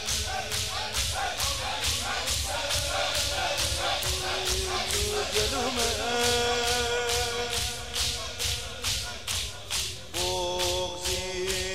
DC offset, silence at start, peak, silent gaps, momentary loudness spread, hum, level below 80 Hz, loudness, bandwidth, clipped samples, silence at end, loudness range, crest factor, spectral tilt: 0.6%; 0 s; -10 dBFS; none; 4 LU; none; -42 dBFS; -27 LUFS; 16 kHz; under 0.1%; 0 s; 3 LU; 18 dB; -1.5 dB/octave